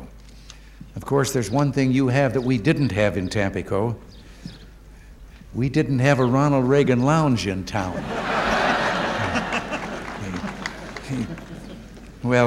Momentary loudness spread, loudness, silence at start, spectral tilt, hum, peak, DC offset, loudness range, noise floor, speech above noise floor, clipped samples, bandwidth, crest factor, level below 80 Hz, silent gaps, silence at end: 18 LU; -22 LUFS; 0 s; -6 dB/octave; none; -2 dBFS; under 0.1%; 6 LU; -44 dBFS; 23 dB; under 0.1%; 14.5 kHz; 20 dB; -44 dBFS; none; 0 s